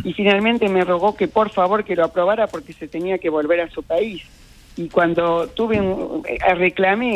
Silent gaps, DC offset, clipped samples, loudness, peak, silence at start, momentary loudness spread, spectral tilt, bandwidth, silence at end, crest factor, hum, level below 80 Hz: none; under 0.1%; under 0.1%; -19 LUFS; -2 dBFS; 0 s; 9 LU; -6.5 dB/octave; 12.5 kHz; 0 s; 16 dB; none; -46 dBFS